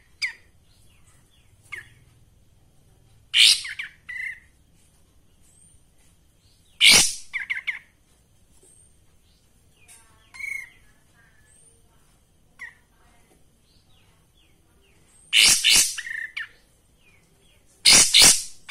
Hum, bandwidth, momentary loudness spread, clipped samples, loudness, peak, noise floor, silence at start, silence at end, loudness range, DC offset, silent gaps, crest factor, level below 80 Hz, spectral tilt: none; 16 kHz; 27 LU; under 0.1%; -16 LUFS; -2 dBFS; -59 dBFS; 0.2 s; 0.2 s; 22 LU; under 0.1%; none; 24 dB; -54 dBFS; 1.5 dB/octave